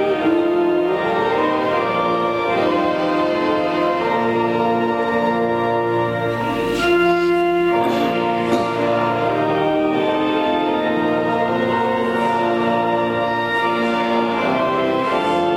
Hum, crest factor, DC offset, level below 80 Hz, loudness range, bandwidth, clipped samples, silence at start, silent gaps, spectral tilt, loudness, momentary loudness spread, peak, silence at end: none; 12 dB; under 0.1%; -50 dBFS; 1 LU; 15 kHz; under 0.1%; 0 s; none; -6 dB/octave; -18 LUFS; 2 LU; -6 dBFS; 0 s